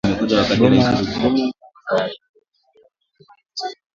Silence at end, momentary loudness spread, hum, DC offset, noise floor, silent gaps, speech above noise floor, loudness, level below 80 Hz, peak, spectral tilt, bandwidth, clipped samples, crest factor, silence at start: 0.2 s; 17 LU; none; under 0.1%; -57 dBFS; 2.29-2.34 s; 41 dB; -18 LUFS; -46 dBFS; 0 dBFS; -6 dB/octave; 7.6 kHz; under 0.1%; 20 dB; 0.05 s